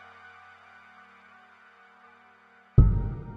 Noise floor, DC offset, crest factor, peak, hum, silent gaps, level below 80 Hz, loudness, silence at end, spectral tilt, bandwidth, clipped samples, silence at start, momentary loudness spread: -58 dBFS; under 0.1%; 22 dB; -6 dBFS; none; none; -32 dBFS; -24 LUFS; 0 s; -11 dB/octave; 3.8 kHz; under 0.1%; 2.75 s; 28 LU